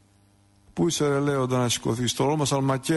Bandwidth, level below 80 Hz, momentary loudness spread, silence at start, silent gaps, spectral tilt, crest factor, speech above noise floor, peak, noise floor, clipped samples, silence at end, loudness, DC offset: 12 kHz; -56 dBFS; 3 LU; 0.75 s; none; -5 dB/octave; 12 dB; 36 dB; -12 dBFS; -60 dBFS; under 0.1%; 0 s; -24 LUFS; under 0.1%